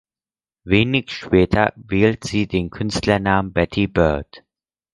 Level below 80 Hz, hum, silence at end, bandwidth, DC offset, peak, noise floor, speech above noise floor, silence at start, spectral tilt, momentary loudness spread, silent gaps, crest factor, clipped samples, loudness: -36 dBFS; none; 0.55 s; 11.5 kHz; under 0.1%; 0 dBFS; under -90 dBFS; over 72 dB; 0.65 s; -6 dB/octave; 6 LU; none; 18 dB; under 0.1%; -19 LUFS